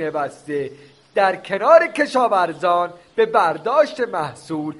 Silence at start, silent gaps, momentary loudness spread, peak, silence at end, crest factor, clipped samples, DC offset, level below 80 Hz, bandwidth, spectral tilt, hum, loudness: 0 s; none; 13 LU; 0 dBFS; 0.05 s; 18 dB; under 0.1%; under 0.1%; -66 dBFS; 11.5 kHz; -5 dB/octave; none; -19 LUFS